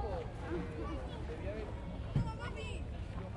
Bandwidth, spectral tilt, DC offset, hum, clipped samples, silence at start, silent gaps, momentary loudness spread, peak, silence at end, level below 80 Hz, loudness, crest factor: 11 kHz; -7.5 dB/octave; under 0.1%; none; under 0.1%; 0 s; none; 6 LU; -22 dBFS; 0 s; -46 dBFS; -42 LUFS; 18 dB